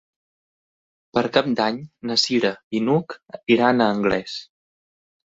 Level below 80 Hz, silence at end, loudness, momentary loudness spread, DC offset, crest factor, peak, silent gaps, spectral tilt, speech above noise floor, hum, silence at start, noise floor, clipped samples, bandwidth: -58 dBFS; 0.9 s; -21 LUFS; 14 LU; under 0.1%; 20 dB; -2 dBFS; 2.63-2.71 s; -5 dB/octave; over 69 dB; none; 1.15 s; under -90 dBFS; under 0.1%; 8 kHz